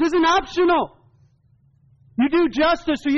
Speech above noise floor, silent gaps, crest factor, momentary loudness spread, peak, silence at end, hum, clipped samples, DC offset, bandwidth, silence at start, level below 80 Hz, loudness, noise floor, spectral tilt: 40 dB; none; 10 dB; 7 LU; -10 dBFS; 0 s; none; under 0.1%; under 0.1%; 7.4 kHz; 0 s; -48 dBFS; -19 LUFS; -58 dBFS; -2 dB/octave